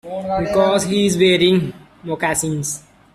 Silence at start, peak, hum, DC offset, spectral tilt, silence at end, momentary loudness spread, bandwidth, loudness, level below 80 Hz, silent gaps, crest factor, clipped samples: 0.05 s; -2 dBFS; none; under 0.1%; -4.5 dB/octave; 0.35 s; 15 LU; 14 kHz; -17 LUFS; -46 dBFS; none; 16 dB; under 0.1%